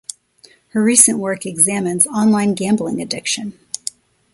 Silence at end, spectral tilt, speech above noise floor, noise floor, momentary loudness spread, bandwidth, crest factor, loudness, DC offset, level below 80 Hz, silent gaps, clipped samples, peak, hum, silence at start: 0.85 s; -3 dB/octave; 34 dB; -50 dBFS; 16 LU; 15.5 kHz; 18 dB; -15 LUFS; under 0.1%; -60 dBFS; none; under 0.1%; 0 dBFS; none; 0.75 s